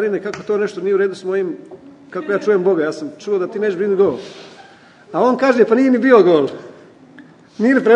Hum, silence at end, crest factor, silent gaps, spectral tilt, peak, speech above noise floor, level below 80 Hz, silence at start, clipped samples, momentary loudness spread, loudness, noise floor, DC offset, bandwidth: none; 0 s; 16 dB; none; -6.5 dB/octave; 0 dBFS; 29 dB; -66 dBFS; 0 s; under 0.1%; 17 LU; -16 LUFS; -44 dBFS; under 0.1%; 9.2 kHz